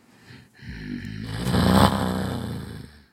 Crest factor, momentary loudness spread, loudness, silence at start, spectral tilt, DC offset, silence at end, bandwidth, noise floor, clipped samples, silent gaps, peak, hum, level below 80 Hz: 24 dB; 22 LU; -24 LUFS; 0.3 s; -6 dB/octave; under 0.1%; 0.2 s; 16 kHz; -49 dBFS; under 0.1%; none; 0 dBFS; none; -40 dBFS